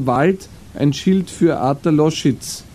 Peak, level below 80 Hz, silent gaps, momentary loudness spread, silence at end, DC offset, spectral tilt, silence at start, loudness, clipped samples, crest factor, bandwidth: -2 dBFS; -46 dBFS; none; 8 LU; 0.05 s; under 0.1%; -6 dB/octave; 0 s; -17 LUFS; under 0.1%; 14 dB; 15 kHz